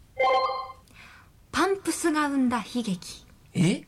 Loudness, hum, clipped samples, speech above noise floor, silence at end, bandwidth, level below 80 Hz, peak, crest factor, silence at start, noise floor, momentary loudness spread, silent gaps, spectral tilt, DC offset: -27 LUFS; none; under 0.1%; 26 dB; 0.05 s; 16 kHz; -58 dBFS; -14 dBFS; 12 dB; 0.15 s; -52 dBFS; 12 LU; none; -5 dB/octave; under 0.1%